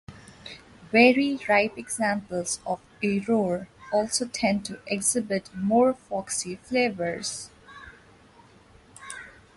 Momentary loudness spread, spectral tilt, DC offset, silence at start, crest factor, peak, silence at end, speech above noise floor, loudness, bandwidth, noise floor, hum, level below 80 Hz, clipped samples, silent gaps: 21 LU; -3.5 dB/octave; under 0.1%; 0.1 s; 22 dB; -6 dBFS; 0.25 s; 29 dB; -25 LUFS; 11.5 kHz; -54 dBFS; none; -60 dBFS; under 0.1%; none